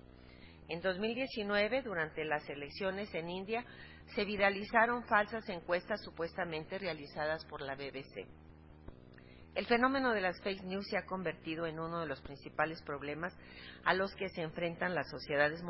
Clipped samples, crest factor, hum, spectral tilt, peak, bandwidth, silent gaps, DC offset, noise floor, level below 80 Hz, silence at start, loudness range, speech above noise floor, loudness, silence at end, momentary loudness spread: under 0.1%; 24 dB; none; -3 dB/octave; -14 dBFS; 5.8 kHz; none; under 0.1%; -56 dBFS; -62 dBFS; 0.1 s; 6 LU; 20 dB; -37 LUFS; 0 s; 15 LU